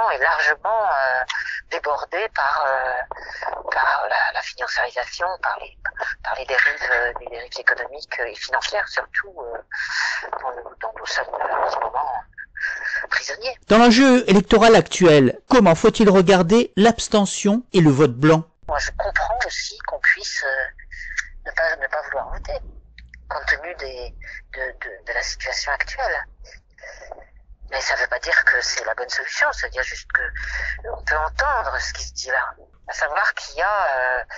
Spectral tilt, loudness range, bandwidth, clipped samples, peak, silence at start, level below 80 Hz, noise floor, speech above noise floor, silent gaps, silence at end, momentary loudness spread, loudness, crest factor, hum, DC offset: -4.5 dB/octave; 11 LU; 9 kHz; under 0.1%; -4 dBFS; 0 s; -40 dBFS; -44 dBFS; 24 dB; none; 0 s; 16 LU; -20 LUFS; 18 dB; none; under 0.1%